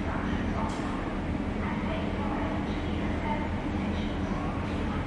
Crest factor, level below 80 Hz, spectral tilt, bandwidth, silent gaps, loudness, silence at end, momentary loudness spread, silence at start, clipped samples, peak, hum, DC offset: 14 dB; -38 dBFS; -7 dB/octave; 11 kHz; none; -31 LUFS; 0 s; 2 LU; 0 s; under 0.1%; -16 dBFS; none; under 0.1%